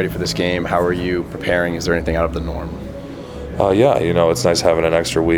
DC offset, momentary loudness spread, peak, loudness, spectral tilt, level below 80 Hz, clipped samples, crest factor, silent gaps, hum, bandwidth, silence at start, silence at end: under 0.1%; 15 LU; 0 dBFS; -17 LUFS; -5 dB/octave; -34 dBFS; under 0.1%; 18 dB; none; none; 19.5 kHz; 0 s; 0 s